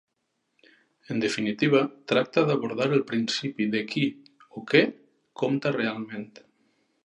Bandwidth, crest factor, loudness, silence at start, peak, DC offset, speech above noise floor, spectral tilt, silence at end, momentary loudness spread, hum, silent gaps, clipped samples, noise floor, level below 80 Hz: 11 kHz; 22 dB; -26 LUFS; 1.1 s; -6 dBFS; under 0.1%; 52 dB; -5.5 dB/octave; 0.8 s; 13 LU; none; none; under 0.1%; -77 dBFS; -72 dBFS